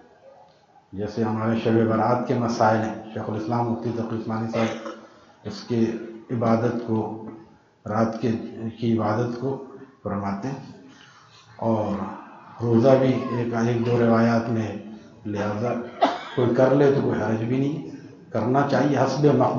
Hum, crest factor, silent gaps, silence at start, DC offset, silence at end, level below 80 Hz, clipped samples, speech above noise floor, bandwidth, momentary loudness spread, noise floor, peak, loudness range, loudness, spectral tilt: none; 22 dB; none; 0.25 s; under 0.1%; 0 s; -62 dBFS; under 0.1%; 33 dB; 7.2 kHz; 18 LU; -55 dBFS; -2 dBFS; 6 LU; -23 LUFS; -7.5 dB/octave